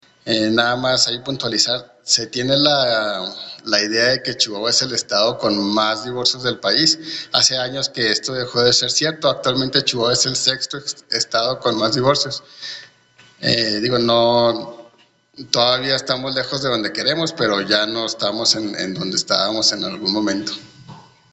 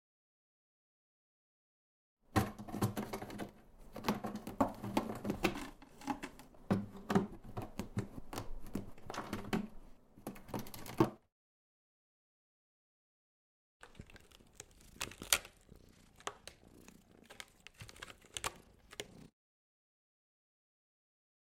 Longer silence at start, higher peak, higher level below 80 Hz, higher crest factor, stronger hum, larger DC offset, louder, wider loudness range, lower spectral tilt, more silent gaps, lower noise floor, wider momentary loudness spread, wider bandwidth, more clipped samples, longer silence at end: second, 0.25 s vs 2.3 s; first, 0 dBFS vs -6 dBFS; about the same, -56 dBFS vs -60 dBFS; second, 20 dB vs 38 dB; neither; neither; first, -17 LUFS vs -41 LUFS; second, 3 LU vs 10 LU; second, -2.5 dB/octave vs -4.5 dB/octave; second, none vs 11.32-13.80 s; second, -54 dBFS vs -62 dBFS; second, 9 LU vs 22 LU; second, 9 kHz vs 16.5 kHz; neither; second, 0.3 s vs 2.15 s